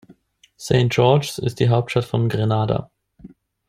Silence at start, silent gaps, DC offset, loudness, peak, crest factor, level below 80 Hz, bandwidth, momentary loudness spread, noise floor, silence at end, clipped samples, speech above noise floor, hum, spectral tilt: 0.6 s; none; under 0.1%; -19 LUFS; -2 dBFS; 18 dB; -50 dBFS; 15 kHz; 9 LU; -53 dBFS; 0.4 s; under 0.1%; 35 dB; none; -6.5 dB/octave